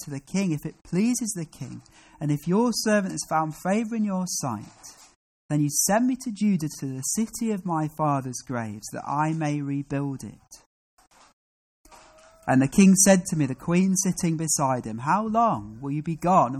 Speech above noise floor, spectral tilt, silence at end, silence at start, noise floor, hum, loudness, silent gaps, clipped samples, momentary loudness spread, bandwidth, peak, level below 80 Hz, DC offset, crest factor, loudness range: 28 dB; -5 dB/octave; 0 s; 0 s; -53 dBFS; none; -24 LUFS; 5.16-5.49 s, 10.66-10.97 s, 11.33-11.84 s; under 0.1%; 12 LU; 15 kHz; -8 dBFS; -58 dBFS; under 0.1%; 18 dB; 9 LU